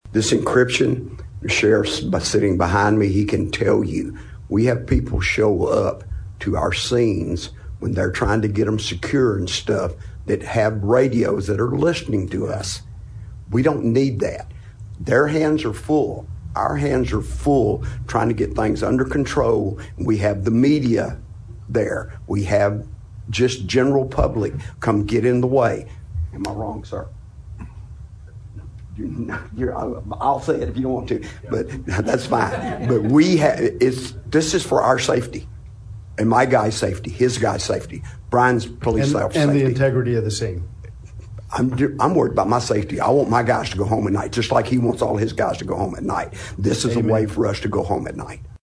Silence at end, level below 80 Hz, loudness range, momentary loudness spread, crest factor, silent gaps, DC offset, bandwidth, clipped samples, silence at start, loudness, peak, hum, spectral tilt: 0.05 s; -36 dBFS; 4 LU; 16 LU; 18 dB; none; under 0.1%; 11 kHz; under 0.1%; 0.05 s; -20 LUFS; -2 dBFS; none; -6 dB/octave